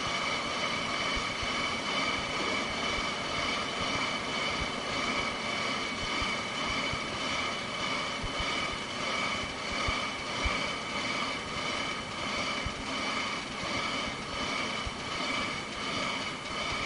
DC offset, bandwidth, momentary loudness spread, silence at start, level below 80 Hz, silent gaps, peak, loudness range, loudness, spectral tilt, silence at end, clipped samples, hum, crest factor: under 0.1%; 10.5 kHz; 3 LU; 0 s; -50 dBFS; none; -16 dBFS; 2 LU; -31 LUFS; -2.5 dB/octave; 0 s; under 0.1%; none; 16 dB